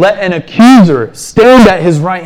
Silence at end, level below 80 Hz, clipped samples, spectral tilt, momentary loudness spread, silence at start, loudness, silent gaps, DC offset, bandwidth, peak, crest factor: 0 s; -34 dBFS; 0.3%; -6 dB/octave; 11 LU; 0 s; -6 LUFS; none; under 0.1%; 14.5 kHz; 0 dBFS; 6 dB